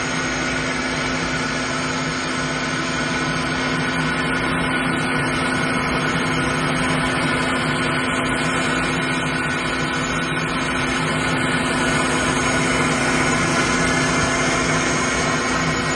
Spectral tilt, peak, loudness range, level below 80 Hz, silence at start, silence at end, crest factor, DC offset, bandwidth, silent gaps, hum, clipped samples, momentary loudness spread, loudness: -3.5 dB/octave; -4 dBFS; 3 LU; -40 dBFS; 0 s; 0 s; 16 dB; under 0.1%; 11.5 kHz; none; none; under 0.1%; 4 LU; -20 LUFS